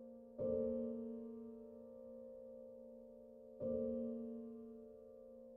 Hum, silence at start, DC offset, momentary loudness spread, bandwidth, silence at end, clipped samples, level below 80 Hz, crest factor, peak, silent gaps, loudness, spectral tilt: none; 0 s; under 0.1%; 17 LU; 3 kHz; 0 s; under 0.1%; -74 dBFS; 18 dB; -30 dBFS; none; -47 LUFS; -11 dB/octave